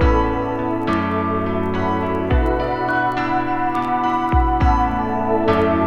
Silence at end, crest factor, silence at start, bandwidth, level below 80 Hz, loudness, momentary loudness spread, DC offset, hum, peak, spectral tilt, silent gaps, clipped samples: 0 s; 14 dB; 0 s; 7.2 kHz; -26 dBFS; -19 LUFS; 4 LU; under 0.1%; none; -4 dBFS; -8 dB/octave; none; under 0.1%